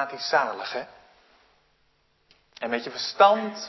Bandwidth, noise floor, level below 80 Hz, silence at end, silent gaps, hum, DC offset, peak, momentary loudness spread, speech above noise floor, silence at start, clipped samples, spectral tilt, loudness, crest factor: 6.2 kHz; -67 dBFS; -74 dBFS; 0 s; none; none; under 0.1%; -4 dBFS; 16 LU; 42 dB; 0 s; under 0.1%; -3 dB/octave; -24 LUFS; 22 dB